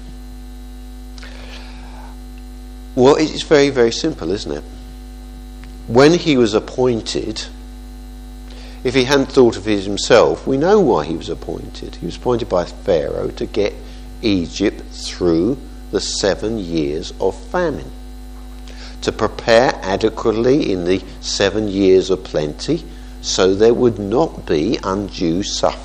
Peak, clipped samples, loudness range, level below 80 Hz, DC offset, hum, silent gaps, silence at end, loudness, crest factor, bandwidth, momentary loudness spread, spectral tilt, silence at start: 0 dBFS; under 0.1%; 5 LU; -34 dBFS; under 0.1%; 50 Hz at -35 dBFS; none; 0 s; -17 LUFS; 18 dB; 12.5 kHz; 23 LU; -5 dB/octave; 0 s